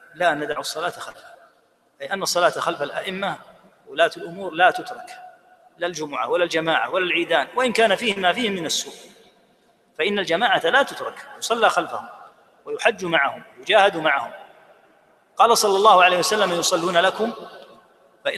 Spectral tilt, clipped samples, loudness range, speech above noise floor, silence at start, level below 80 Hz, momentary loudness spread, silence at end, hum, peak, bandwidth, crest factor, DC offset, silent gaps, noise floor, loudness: -2.5 dB/octave; under 0.1%; 6 LU; 40 dB; 0.15 s; -68 dBFS; 17 LU; 0 s; none; -2 dBFS; 15 kHz; 20 dB; under 0.1%; none; -61 dBFS; -20 LUFS